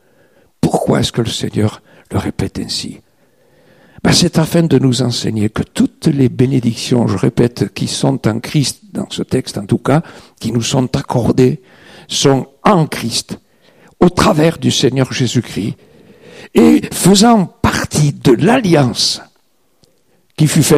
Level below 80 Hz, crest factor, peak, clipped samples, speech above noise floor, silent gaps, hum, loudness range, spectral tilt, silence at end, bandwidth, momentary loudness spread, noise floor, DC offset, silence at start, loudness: -40 dBFS; 14 dB; 0 dBFS; under 0.1%; 46 dB; none; none; 5 LU; -5 dB/octave; 0 s; 15.5 kHz; 10 LU; -59 dBFS; 0.1%; 0.65 s; -14 LUFS